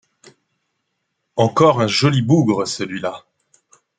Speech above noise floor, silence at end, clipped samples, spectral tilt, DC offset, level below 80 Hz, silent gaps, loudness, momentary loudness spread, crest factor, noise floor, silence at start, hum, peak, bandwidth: 58 dB; 0.8 s; under 0.1%; -6 dB/octave; under 0.1%; -60 dBFS; none; -17 LUFS; 14 LU; 18 dB; -74 dBFS; 1.35 s; none; -2 dBFS; 9.4 kHz